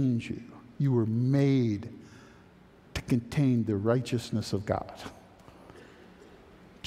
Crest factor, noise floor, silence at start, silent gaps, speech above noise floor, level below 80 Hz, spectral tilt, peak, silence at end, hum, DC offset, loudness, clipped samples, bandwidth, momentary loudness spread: 18 dB; -56 dBFS; 0 s; none; 28 dB; -56 dBFS; -7.5 dB/octave; -12 dBFS; 1.05 s; none; under 0.1%; -29 LUFS; under 0.1%; 13.5 kHz; 18 LU